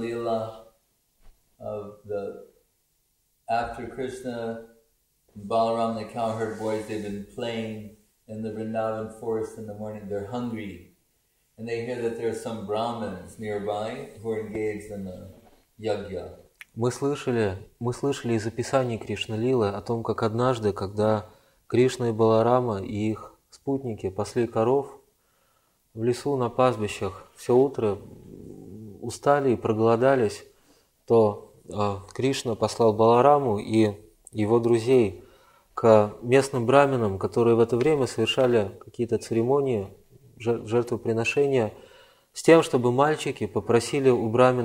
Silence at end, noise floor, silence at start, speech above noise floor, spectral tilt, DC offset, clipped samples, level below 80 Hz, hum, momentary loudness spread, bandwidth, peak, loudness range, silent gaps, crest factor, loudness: 0 s; -70 dBFS; 0 s; 46 dB; -6.5 dB/octave; under 0.1%; under 0.1%; -60 dBFS; none; 16 LU; 15.5 kHz; -2 dBFS; 11 LU; none; 22 dB; -25 LUFS